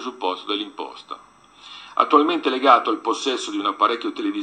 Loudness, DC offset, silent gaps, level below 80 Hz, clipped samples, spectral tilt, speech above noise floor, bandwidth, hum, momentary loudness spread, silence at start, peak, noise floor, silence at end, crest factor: -20 LUFS; under 0.1%; none; -74 dBFS; under 0.1%; -2.5 dB/octave; 24 dB; 9.4 kHz; none; 21 LU; 0 s; 0 dBFS; -45 dBFS; 0 s; 20 dB